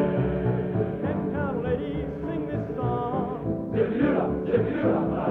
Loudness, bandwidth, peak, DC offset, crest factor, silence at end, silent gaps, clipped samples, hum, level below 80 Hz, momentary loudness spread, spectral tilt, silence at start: -27 LUFS; 4.4 kHz; -10 dBFS; under 0.1%; 16 dB; 0 s; none; under 0.1%; none; -44 dBFS; 6 LU; -10.5 dB/octave; 0 s